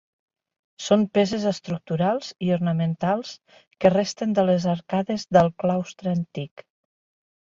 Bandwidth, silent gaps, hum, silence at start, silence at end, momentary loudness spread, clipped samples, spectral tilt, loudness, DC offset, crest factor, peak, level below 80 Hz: 7.6 kHz; 3.67-3.71 s; none; 0.8 s; 1 s; 10 LU; under 0.1%; -6.5 dB/octave; -23 LUFS; under 0.1%; 20 dB; -4 dBFS; -60 dBFS